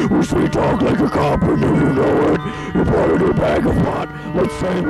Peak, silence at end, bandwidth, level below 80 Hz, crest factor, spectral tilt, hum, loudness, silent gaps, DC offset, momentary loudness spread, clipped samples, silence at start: -6 dBFS; 0 s; 12.5 kHz; -32 dBFS; 10 dB; -7.5 dB/octave; none; -16 LUFS; none; under 0.1%; 5 LU; under 0.1%; 0 s